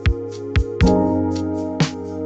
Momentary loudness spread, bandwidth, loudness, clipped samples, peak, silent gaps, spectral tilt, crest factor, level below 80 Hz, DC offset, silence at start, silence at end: 7 LU; 8.2 kHz; -20 LUFS; under 0.1%; -4 dBFS; none; -7 dB/octave; 16 dB; -26 dBFS; under 0.1%; 0 s; 0 s